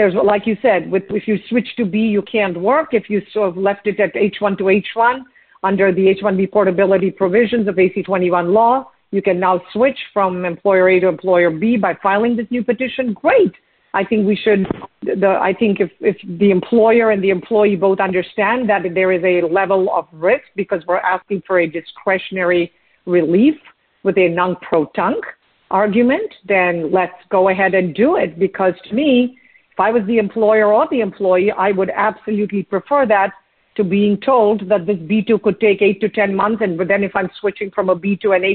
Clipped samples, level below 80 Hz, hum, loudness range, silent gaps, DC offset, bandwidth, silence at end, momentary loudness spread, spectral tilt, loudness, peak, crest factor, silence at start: under 0.1%; -56 dBFS; none; 2 LU; none; under 0.1%; 4.4 kHz; 0 s; 6 LU; -5 dB/octave; -16 LUFS; 0 dBFS; 14 dB; 0 s